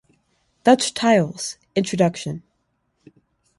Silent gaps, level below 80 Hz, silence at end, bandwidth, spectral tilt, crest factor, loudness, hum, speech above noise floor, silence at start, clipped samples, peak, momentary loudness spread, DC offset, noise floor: none; -62 dBFS; 1.2 s; 11.5 kHz; -4.5 dB/octave; 20 dB; -20 LUFS; none; 51 dB; 0.65 s; under 0.1%; -2 dBFS; 14 LU; under 0.1%; -70 dBFS